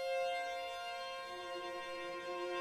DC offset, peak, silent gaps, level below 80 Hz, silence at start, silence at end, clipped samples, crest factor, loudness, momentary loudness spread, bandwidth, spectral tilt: under 0.1%; -28 dBFS; none; -76 dBFS; 0 s; 0 s; under 0.1%; 12 dB; -42 LUFS; 6 LU; 16 kHz; -2 dB/octave